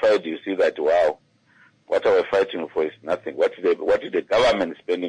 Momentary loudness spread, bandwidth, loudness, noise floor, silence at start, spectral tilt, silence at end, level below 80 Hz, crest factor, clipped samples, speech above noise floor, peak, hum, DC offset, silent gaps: 7 LU; 10.5 kHz; -22 LUFS; -57 dBFS; 0 s; -4.5 dB/octave; 0 s; -56 dBFS; 12 dB; under 0.1%; 36 dB; -10 dBFS; none; under 0.1%; none